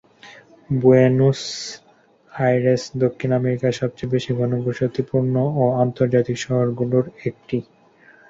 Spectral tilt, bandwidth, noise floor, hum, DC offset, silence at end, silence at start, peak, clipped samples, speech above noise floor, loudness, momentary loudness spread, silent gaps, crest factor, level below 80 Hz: -7 dB/octave; 7.8 kHz; -54 dBFS; none; under 0.1%; 0.7 s; 0.25 s; -2 dBFS; under 0.1%; 35 dB; -20 LUFS; 12 LU; none; 18 dB; -56 dBFS